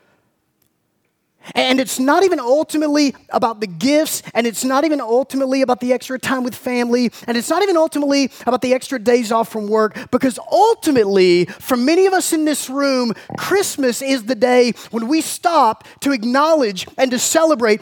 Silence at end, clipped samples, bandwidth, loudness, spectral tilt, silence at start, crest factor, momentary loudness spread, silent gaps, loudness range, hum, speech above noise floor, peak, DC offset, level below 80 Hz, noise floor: 0.05 s; under 0.1%; 19.5 kHz; -16 LUFS; -3.5 dB/octave; 1.45 s; 16 dB; 6 LU; none; 2 LU; none; 51 dB; -2 dBFS; under 0.1%; -62 dBFS; -67 dBFS